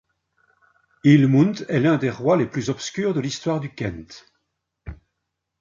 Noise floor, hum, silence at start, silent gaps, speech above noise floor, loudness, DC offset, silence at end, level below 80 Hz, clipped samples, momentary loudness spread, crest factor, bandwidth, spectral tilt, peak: -79 dBFS; none; 1.05 s; none; 59 dB; -21 LUFS; under 0.1%; 0.65 s; -50 dBFS; under 0.1%; 19 LU; 20 dB; 7.6 kHz; -7 dB/octave; -4 dBFS